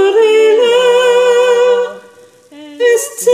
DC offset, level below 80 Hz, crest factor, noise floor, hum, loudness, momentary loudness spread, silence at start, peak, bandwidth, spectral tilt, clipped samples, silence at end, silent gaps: under 0.1%; -66 dBFS; 10 dB; -41 dBFS; none; -10 LUFS; 6 LU; 0 s; 0 dBFS; 15.5 kHz; -1 dB/octave; under 0.1%; 0 s; none